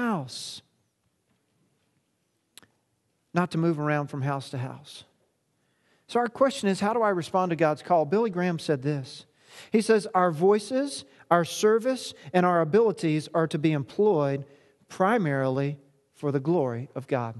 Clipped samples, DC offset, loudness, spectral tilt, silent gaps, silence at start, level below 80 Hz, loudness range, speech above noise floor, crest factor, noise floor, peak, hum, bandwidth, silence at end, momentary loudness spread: under 0.1%; under 0.1%; -26 LUFS; -6 dB/octave; none; 0 s; -74 dBFS; 7 LU; 49 dB; 22 dB; -74 dBFS; -6 dBFS; none; 12.5 kHz; 0 s; 13 LU